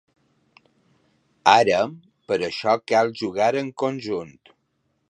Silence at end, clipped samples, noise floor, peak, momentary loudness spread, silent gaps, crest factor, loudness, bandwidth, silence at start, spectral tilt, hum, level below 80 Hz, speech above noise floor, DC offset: 0.8 s; under 0.1%; -71 dBFS; 0 dBFS; 12 LU; none; 22 dB; -22 LUFS; 10.5 kHz; 1.45 s; -4.5 dB/octave; none; -64 dBFS; 50 dB; under 0.1%